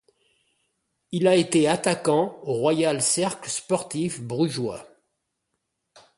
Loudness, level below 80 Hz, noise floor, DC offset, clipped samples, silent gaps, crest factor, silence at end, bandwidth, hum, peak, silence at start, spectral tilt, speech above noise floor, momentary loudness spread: -23 LUFS; -66 dBFS; -78 dBFS; under 0.1%; under 0.1%; none; 18 dB; 1.3 s; 11.5 kHz; none; -6 dBFS; 1.1 s; -4.5 dB/octave; 55 dB; 10 LU